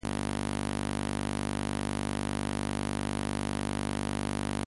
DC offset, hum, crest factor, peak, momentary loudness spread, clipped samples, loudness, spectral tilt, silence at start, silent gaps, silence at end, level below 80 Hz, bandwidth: under 0.1%; none; 16 dB; -18 dBFS; 0 LU; under 0.1%; -33 LUFS; -5 dB/octave; 0.05 s; none; 0 s; -42 dBFS; 11.5 kHz